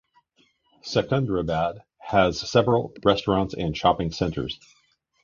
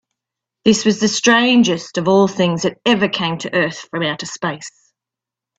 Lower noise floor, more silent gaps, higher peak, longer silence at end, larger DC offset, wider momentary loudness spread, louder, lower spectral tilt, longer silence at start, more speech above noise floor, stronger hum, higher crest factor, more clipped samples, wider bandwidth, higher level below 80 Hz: second, -65 dBFS vs -86 dBFS; neither; second, -4 dBFS vs 0 dBFS; second, 0.7 s vs 0.9 s; neither; about the same, 10 LU vs 11 LU; second, -24 LUFS vs -16 LUFS; first, -6 dB/octave vs -4 dB/octave; first, 0.85 s vs 0.65 s; second, 42 dB vs 70 dB; neither; about the same, 20 dB vs 16 dB; neither; second, 7.4 kHz vs 8.4 kHz; first, -46 dBFS vs -58 dBFS